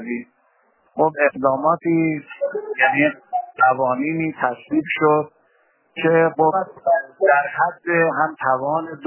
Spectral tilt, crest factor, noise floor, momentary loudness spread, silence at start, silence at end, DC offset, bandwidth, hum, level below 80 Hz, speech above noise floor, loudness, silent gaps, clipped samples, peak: -10 dB/octave; 18 dB; -61 dBFS; 9 LU; 0 s; 0 s; under 0.1%; 3.2 kHz; none; -68 dBFS; 42 dB; -19 LUFS; none; under 0.1%; -2 dBFS